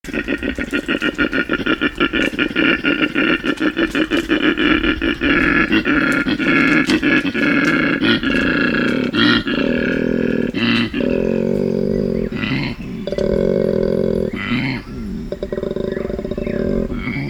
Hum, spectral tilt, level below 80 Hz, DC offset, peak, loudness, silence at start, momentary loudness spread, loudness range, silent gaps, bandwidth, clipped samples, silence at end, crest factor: none; -6 dB/octave; -36 dBFS; under 0.1%; 0 dBFS; -17 LUFS; 0.05 s; 8 LU; 5 LU; none; 15.5 kHz; under 0.1%; 0 s; 16 dB